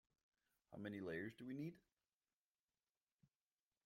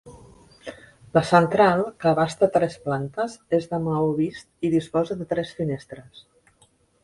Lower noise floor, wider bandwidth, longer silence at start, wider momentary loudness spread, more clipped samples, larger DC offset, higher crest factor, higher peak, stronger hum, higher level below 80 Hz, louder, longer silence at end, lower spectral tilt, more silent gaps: first, under -90 dBFS vs -61 dBFS; first, 16 kHz vs 11.5 kHz; first, 0.7 s vs 0.05 s; second, 6 LU vs 19 LU; neither; neither; about the same, 20 dB vs 24 dB; second, -36 dBFS vs 0 dBFS; neither; second, -88 dBFS vs -58 dBFS; second, -52 LUFS vs -23 LUFS; first, 2.05 s vs 1.05 s; about the same, -7.5 dB/octave vs -7 dB/octave; neither